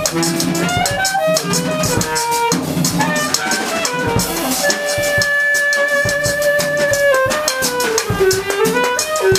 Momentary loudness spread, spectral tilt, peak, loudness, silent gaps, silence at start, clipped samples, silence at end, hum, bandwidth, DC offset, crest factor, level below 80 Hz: 4 LU; -3 dB/octave; 0 dBFS; -15 LUFS; none; 0 s; under 0.1%; 0 s; none; 16 kHz; under 0.1%; 16 dB; -40 dBFS